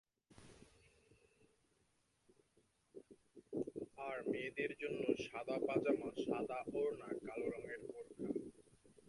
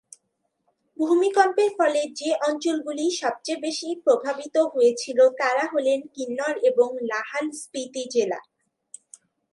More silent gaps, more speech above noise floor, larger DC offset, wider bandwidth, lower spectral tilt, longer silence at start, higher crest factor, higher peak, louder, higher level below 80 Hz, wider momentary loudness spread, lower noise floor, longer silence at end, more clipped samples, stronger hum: neither; second, 37 dB vs 52 dB; neither; about the same, 11.5 kHz vs 11.5 kHz; first, -6 dB/octave vs -2.5 dB/octave; second, 0.4 s vs 1 s; about the same, 22 dB vs 18 dB; second, -24 dBFS vs -6 dBFS; second, -43 LUFS vs -23 LUFS; about the same, -78 dBFS vs -82 dBFS; first, 21 LU vs 9 LU; first, -80 dBFS vs -75 dBFS; second, 0.15 s vs 1.15 s; neither; neither